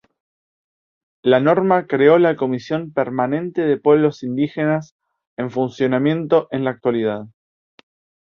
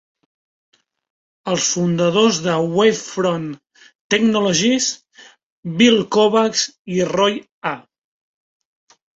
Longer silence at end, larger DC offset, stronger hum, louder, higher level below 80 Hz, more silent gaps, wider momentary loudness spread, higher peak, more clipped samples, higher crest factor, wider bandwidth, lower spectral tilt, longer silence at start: second, 1 s vs 1.35 s; neither; neither; about the same, -18 LUFS vs -17 LUFS; about the same, -62 dBFS vs -60 dBFS; second, 4.91-4.99 s, 5.27-5.37 s vs 3.95-4.10 s, 5.43-5.63 s, 6.79-6.85 s, 7.51-7.62 s; second, 9 LU vs 14 LU; about the same, -2 dBFS vs -2 dBFS; neither; about the same, 18 dB vs 18 dB; second, 6.8 kHz vs 8 kHz; first, -8 dB/octave vs -4 dB/octave; second, 1.25 s vs 1.45 s